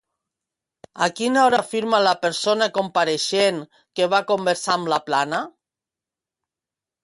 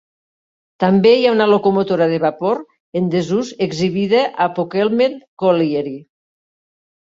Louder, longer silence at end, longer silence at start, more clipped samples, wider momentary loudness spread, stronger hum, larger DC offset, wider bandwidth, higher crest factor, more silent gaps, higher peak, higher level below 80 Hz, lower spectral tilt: second, -20 LUFS vs -16 LUFS; first, 1.55 s vs 1 s; first, 0.95 s vs 0.8 s; neither; about the same, 7 LU vs 9 LU; neither; neither; first, 11.5 kHz vs 7.8 kHz; about the same, 18 dB vs 16 dB; second, none vs 2.80-2.93 s, 5.28-5.37 s; about the same, -4 dBFS vs -2 dBFS; second, -70 dBFS vs -58 dBFS; second, -3 dB/octave vs -6.5 dB/octave